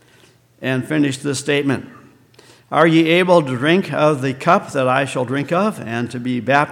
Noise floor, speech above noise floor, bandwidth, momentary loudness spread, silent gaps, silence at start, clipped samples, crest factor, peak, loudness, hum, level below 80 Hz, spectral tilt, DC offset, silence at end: -51 dBFS; 35 dB; 15.5 kHz; 9 LU; none; 0.6 s; under 0.1%; 18 dB; 0 dBFS; -17 LUFS; none; -64 dBFS; -5.5 dB/octave; under 0.1%; 0 s